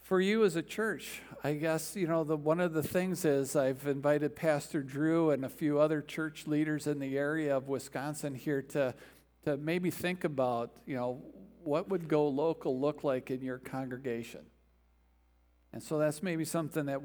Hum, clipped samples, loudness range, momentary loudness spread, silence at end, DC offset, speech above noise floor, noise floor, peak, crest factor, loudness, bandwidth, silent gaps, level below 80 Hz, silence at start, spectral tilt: none; under 0.1%; 6 LU; 9 LU; 0 s; under 0.1%; 35 dB; -68 dBFS; -16 dBFS; 18 dB; -33 LUFS; over 20 kHz; none; -68 dBFS; 0.05 s; -6 dB/octave